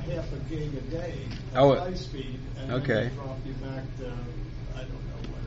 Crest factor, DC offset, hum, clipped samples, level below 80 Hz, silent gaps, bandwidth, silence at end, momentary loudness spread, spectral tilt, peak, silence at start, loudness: 20 dB; under 0.1%; none; under 0.1%; -40 dBFS; none; 7.6 kHz; 0 s; 16 LU; -6 dB/octave; -10 dBFS; 0 s; -31 LUFS